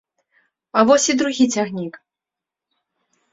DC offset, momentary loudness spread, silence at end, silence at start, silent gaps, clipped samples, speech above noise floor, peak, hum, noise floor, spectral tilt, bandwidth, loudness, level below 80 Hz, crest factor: under 0.1%; 14 LU; 1.35 s; 0.75 s; none; under 0.1%; 70 dB; -2 dBFS; none; -87 dBFS; -3.5 dB/octave; 8 kHz; -17 LUFS; -64 dBFS; 20 dB